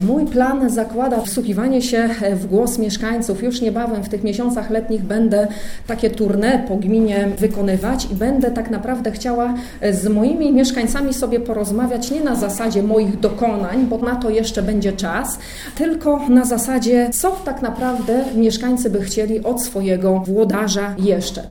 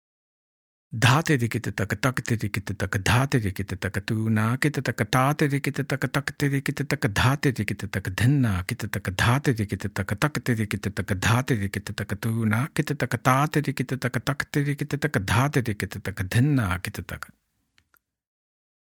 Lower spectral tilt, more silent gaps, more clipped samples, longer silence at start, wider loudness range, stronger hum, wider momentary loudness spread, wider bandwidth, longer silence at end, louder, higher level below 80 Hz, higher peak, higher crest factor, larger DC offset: about the same, -5 dB/octave vs -5.5 dB/octave; neither; neither; second, 0 s vs 0.9 s; about the same, 2 LU vs 2 LU; neither; about the same, 6 LU vs 8 LU; about the same, 20 kHz vs 18.5 kHz; second, 0 s vs 1.65 s; first, -18 LUFS vs -25 LUFS; first, -36 dBFS vs -52 dBFS; about the same, -2 dBFS vs -2 dBFS; second, 16 dB vs 22 dB; neither